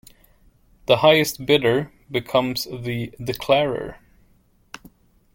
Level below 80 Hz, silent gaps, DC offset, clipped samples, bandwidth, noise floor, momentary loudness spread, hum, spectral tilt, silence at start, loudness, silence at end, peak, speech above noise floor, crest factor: -52 dBFS; none; under 0.1%; under 0.1%; 17 kHz; -59 dBFS; 19 LU; none; -4.5 dB/octave; 0.9 s; -21 LUFS; 1.4 s; -2 dBFS; 38 dB; 22 dB